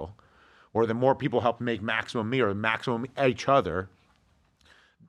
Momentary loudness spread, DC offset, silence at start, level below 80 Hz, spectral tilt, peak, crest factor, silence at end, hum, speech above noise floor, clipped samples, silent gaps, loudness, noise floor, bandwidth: 9 LU; under 0.1%; 0 s; -60 dBFS; -6.5 dB/octave; -8 dBFS; 20 dB; 1.2 s; none; 39 dB; under 0.1%; none; -27 LUFS; -66 dBFS; 11 kHz